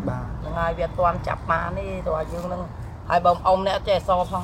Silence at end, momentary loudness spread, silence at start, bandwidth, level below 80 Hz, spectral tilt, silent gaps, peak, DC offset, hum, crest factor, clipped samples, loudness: 0 s; 11 LU; 0 s; 15.5 kHz; -36 dBFS; -6.5 dB/octave; none; -4 dBFS; under 0.1%; none; 18 dB; under 0.1%; -24 LUFS